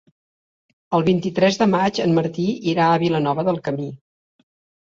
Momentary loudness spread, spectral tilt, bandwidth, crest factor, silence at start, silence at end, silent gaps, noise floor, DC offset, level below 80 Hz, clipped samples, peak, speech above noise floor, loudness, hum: 7 LU; -6.5 dB/octave; 7.6 kHz; 16 dB; 0.9 s; 0.9 s; none; under -90 dBFS; under 0.1%; -60 dBFS; under 0.1%; -4 dBFS; over 71 dB; -20 LUFS; none